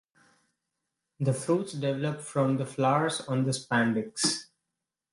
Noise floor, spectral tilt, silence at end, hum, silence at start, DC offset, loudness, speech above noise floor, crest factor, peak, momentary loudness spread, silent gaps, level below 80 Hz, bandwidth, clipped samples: -87 dBFS; -5 dB/octave; 0.7 s; none; 1.2 s; under 0.1%; -28 LUFS; 59 dB; 18 dB; -12 dBFS; 5 LU; none; -72 dBFS; 11.5 kHz; under 0.1%